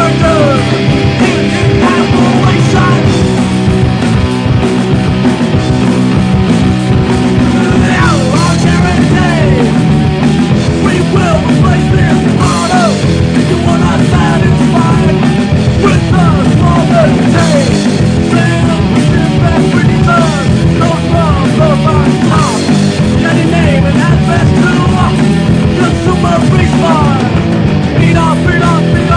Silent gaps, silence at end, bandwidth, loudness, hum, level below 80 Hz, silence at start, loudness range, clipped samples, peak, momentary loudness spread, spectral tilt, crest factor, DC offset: none; 0 s; 10 kHz; -9 LUFS; none; -24 dBFS; 0 s; 1 LU; 0.1%; 0 dBFS; 2 LU; -6.5 dB/octave; 8 dB; under 0.1%